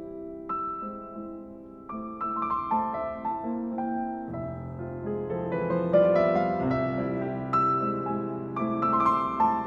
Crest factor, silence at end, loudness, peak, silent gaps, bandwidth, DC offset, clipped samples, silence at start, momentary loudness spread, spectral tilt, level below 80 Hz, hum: 18 dB; 0 s; -28 LUFS; -10 dBFS; none; 7 kHz; under 0.1%; under 0.1%; 0 s; 15 LU; -9.5 dB/octave; -56 dBFS; none